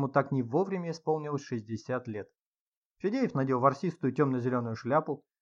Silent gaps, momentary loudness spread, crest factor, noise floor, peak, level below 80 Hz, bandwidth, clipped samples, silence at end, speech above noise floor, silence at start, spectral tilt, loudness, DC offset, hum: 2.42-2.95 s; 10 LU; 20 dB; under -90 dBFS; -10 dBFS; -78 dBFS; 7.4 kHz; under 0.1%; 0.25 s; over 60 dB; 0 s; -8 dB/octave; -31 LUFS; under 0.1%; none